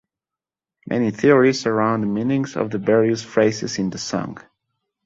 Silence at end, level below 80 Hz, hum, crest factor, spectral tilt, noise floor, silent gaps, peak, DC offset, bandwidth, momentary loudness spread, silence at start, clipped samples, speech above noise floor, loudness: 0.65 s; -58 dBFS; none; 18 dB; -5.5 dB/octave; -89 dBFS; none; -2 dBFS; under 0.1%; 7.8 kHz; 10 LU; 0.85 s; under 0.1%; 70 dB; -20 LUFS